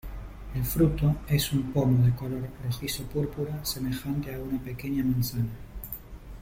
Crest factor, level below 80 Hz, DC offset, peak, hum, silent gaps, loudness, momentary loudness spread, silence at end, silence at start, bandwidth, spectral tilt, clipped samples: 16 dB; -42 dBFS; under 0.1%; -12 dBFS; none; none; -28 LUFS; 15 LU; 0 s; 0.05 s; 16.5 kHz; -6 dB/octave; under 0.1%